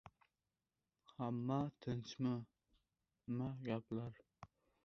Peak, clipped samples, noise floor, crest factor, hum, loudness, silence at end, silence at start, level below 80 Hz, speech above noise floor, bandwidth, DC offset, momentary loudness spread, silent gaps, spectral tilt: -26 dBFS; under 0.1%; under -90 dBFS; 20 dB; none; -45 LUFS; 0.4 s; 0.05 s; -74 dBFS; over 47 dB; 6.6 kHz; under 0.1%; 21 LU; none; -7.5 dB/octave